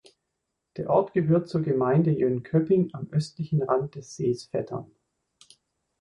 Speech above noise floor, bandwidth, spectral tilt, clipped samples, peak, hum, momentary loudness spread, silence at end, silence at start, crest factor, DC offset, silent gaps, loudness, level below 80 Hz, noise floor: 56 dB; 10.5 kHz; -8.5 dB/octave; under 0.1%; -8 dBFS; none; 12 LU; 1.15 s; 0.75 s; 18 dB; under 0.1%; none; -26 LUFS; -62 dBFS; -81 dBFS